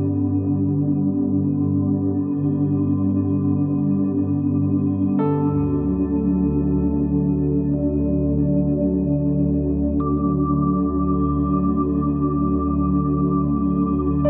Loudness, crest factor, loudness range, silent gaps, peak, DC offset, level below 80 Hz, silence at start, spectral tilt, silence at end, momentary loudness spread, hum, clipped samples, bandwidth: -20 LUFS; 12 dB; 0 LU; none; -8 dBFS; under 0.1%; -34 dBFS; 0 s; -13.5 dB/octave; 0 s; 1 LU; none; under 0.1%; 2.6 kHz